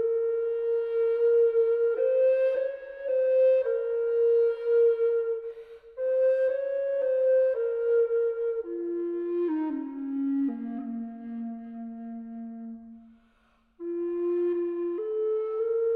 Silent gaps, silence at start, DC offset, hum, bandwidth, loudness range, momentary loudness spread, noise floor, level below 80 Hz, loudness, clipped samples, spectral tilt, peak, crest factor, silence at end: none; 0 s; under 0.1%; none; 4 kHz; 10 LU; 16 LU; -66 dBFS; -70 dBFS; -27 LUFS; under 0.1%; -8.5 dB/octave; -16 dBFS; 10 dB; 0 s